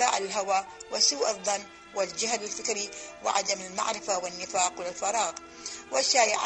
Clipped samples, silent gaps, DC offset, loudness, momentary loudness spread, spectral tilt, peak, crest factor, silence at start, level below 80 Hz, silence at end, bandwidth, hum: under 0.1%; none; under 0.1%; -28 LUFS; 10 LU; 0 dB/octave; -8 dBFS; 22 dB; 0 s; -68 dBFS; 0 s; 9.2 kHz; none